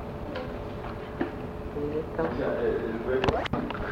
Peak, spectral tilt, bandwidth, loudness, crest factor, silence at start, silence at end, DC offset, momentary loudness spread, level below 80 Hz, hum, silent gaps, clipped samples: -8 dBFS; -7.5 dB/octave; 16 kHz; -31 LUFS; 22 dB; 0 s; 0 s; under 0.1%; 10 LU; -44 dBFS; none; none; under 0.1%